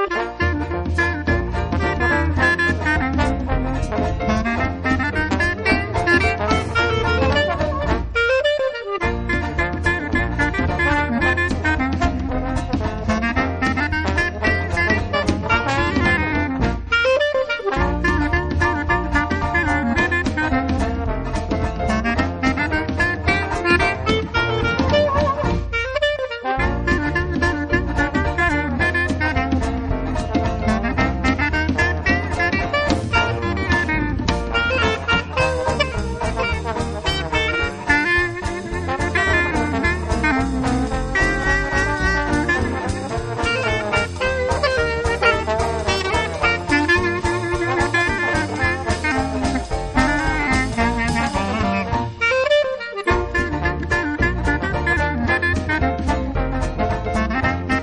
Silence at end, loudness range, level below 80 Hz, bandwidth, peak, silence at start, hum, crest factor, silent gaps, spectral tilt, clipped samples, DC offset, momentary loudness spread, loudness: 0 s; 2 LU; -28 dBFS; 10.5 kHz; -2 dBFS; 0 s; none; 18 dB; none; -5.5 dB/octave; under 0.1%; under 0.1%; 5 LU; -20 LUFS